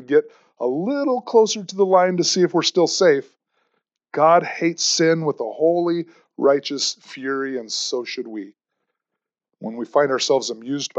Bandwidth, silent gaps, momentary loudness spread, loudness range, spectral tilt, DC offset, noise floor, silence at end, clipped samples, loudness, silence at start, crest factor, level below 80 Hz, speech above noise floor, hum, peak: 8.4 kHz; none; 13 LU; 7 LU; -3.5 dB/octave; under 0.1%; -84 dBFS; 0 s; under 0.1%; -20 LUFS; 0 s; 18 dB; -88 dBFS; 64 dB; none; -2 dBFS